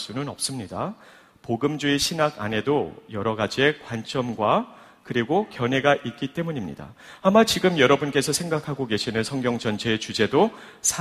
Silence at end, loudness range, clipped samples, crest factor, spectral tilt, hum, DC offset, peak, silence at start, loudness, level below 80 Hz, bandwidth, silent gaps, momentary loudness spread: 0 s; 3 LU; under 0.1%; 20 dB; -4 dB/octave; none; under 0.1%; -4 dBFS; 0 s; -24 LUFS; -56 dBFS; 15.5 kHz; none; 12 LU